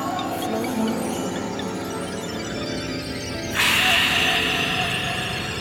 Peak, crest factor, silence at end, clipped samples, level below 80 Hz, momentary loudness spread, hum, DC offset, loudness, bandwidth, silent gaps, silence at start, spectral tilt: -6 dBFS; 18 dB; 0 s; under 0.1%; -46 dBFS; 12 LU; 50 Hz at -55 dBFS; under 0.1%; -22 LUFS; 19 kHz; none; 0 s; -3 dB/octave